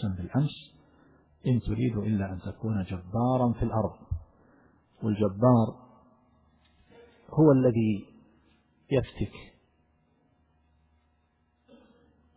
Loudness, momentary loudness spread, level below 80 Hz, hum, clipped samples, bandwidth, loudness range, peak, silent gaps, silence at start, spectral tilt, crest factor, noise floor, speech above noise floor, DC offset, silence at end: -28 LUFS; 14 LU; -48 dBFS; none; under 0.1%; 4 kHz; 11 LU; -8 dBFS; none; 0 s; -12.5 dB/octave; 20 dB; -70 dBFS; 44 dB; under 0.1%; 2.95 s